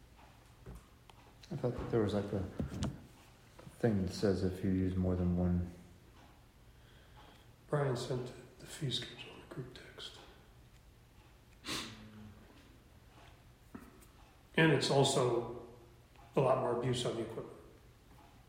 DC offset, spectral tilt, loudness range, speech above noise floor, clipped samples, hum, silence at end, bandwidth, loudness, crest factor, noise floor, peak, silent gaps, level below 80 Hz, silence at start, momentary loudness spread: under 0.1%; -5.5 dB/octave; 15 LU; 27 dB; under 0.1%; none; 0.2 s; 16 kHz; -36 LUFS; 24 dB; -61 dBFS; -14 dBFS; none; -58 dBFS; 0.2 s; 25 LU